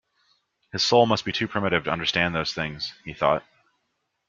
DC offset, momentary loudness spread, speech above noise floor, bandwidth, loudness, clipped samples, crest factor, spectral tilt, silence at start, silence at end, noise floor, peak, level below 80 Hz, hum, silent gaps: under 0.1%; 11 LU; 52 dB; 7.6 kHz; -24 LUFS; under 0.1%; 22 dB; -4.5 dB/octave; 0.75 s; 0.9 s; -76 dBFS; -4 dBFS; -56 dBFS; none; none